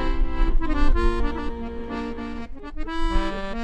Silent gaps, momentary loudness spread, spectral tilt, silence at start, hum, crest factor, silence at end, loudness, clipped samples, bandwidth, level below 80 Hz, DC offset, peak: none; 10 LU; -7 dB/octave; 0 s; none; 14 dB; 0 s; -28 LUFS; under 0.1%; 7.6 kHz; -24 dBFS; under 0.1%; -8 dBFS